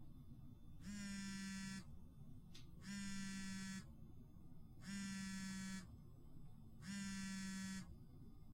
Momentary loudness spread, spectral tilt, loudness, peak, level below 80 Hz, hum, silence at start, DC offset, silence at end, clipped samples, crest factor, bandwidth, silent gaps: 14 LU; -4 dB/octave; -52 LUFS; -38 dBFS; -64 dBFS; none; 0 s; under 0.1%; 0 s; under 0.1%; 14 dB; 16 kHz; none